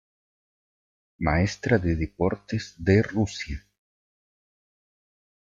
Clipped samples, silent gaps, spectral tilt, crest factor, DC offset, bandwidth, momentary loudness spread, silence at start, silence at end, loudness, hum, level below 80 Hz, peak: under 0.1%; none; -6.5 dB/octave; 20 dB; under 0.1%; 7.6 kHz; 11 LU; 1.2 s; 1.95 s; -25 LUFS; none; -44 dBFS; -8 dBFS